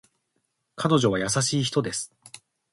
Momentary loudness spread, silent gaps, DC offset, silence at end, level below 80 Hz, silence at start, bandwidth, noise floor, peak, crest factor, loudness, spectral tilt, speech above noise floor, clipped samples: 10 LU; none; under 0.1%; 0.35 s; -58 dBFS; 0.75 s; 11.5 kHz; -75 dBFS; -6 dBFS; 20 dB; -24 LUFS; -4.5 dB/octave; 52 dB; under 0.1%